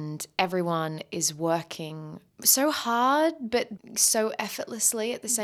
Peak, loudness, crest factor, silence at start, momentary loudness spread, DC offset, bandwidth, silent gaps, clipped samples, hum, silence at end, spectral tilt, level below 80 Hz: -4 dBFS; -25 LUFS; 22 dB; 0 s; 12 LU; under 0.1%; over 20 kHz; none; under 0.1%; none; 0 s; -2.5 dB/octave; -70 dBFS